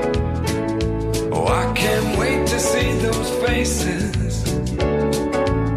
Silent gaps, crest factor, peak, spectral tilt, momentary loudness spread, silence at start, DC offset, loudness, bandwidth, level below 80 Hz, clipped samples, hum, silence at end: none; 14 dB; -6 dBFS; -5 dB/octave; 4 LU; 0 s; under 0.1%; -20 LUFS; 15.5 kHz; -28 dBFS; under 0.1%; none; 0 s